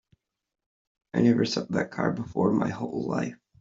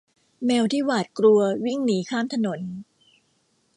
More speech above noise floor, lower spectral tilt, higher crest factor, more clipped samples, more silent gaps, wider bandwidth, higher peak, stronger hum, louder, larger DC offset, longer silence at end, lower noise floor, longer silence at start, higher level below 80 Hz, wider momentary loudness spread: about the same, 43 dB vs 45 dB; about the same, -6.5 dB/octave vs -5.5 dB/octave; about the same, 20 dB vs 16 dB; neither; neither; second, 7.6 kHz vs 11 kHz; about the same, -8 dBFS vs -8 dBFS; neither; second, -27 LUFS vs -23 LUFS; neither; second, 0.25 s vs 0.95 s; about the same, -69 dBFS vs -67 dBFS; first, 1.15 s vs 0.4 s; first, -62 dBFS vs -72 dBFS; second, 9 LU vs 12 LU